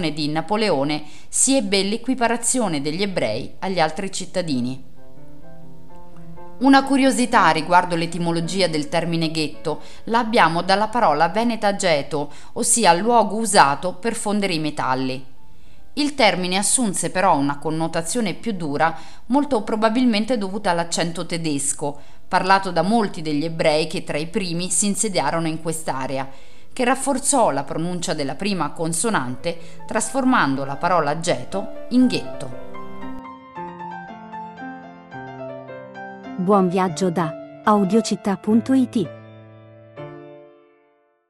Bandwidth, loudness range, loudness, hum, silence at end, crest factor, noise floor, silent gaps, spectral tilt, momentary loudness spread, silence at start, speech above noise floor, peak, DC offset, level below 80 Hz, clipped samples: 14.5 kHz; 7 LU; -20 LUFS; none; 0 s; 22 dB; -61 dBFS; none; -4 dB/octave; 18 LU; 0 s; 41 dB; 0 dBFS; 3%; -52 dBFS; under 0.1%